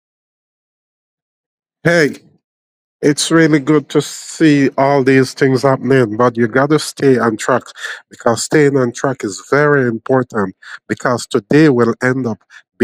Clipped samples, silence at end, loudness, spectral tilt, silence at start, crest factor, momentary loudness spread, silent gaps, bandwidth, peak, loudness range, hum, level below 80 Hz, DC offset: under 0.1%; 0 s; -14 LUFS; -5.5 dB/octave; 1.85 s; 14 dB; 9 LU; 2.44-3.00 s; 16 kHz; 0 dBFS; 3 LU; none; -58 dBFS; under 0.1%